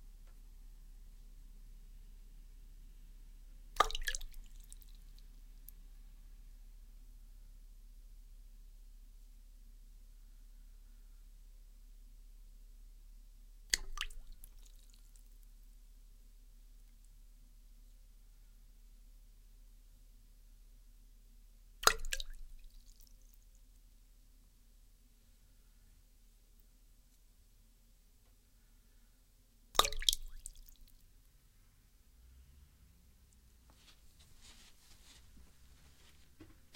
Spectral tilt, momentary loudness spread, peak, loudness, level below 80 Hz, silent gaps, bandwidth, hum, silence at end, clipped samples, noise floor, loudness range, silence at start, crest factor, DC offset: 0 dB/octave; 29 LU; -6 dBFS; -36 LUFS; -52 dBFS; none; 16.5 kHz; none; 0 s; under 0.1%; -66 dBFS; 26 LU; 0 s; 42 dB; under 0.1%